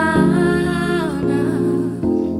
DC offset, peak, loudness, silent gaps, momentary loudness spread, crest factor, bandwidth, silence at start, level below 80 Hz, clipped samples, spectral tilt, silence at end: under 0.1%; -4 dBFS; -18 LUFS; none; 5 LU; 14 dB; 13 kHz; 0 s; -40 dBFS; under 0.1%; -7 dB/octave; 0 s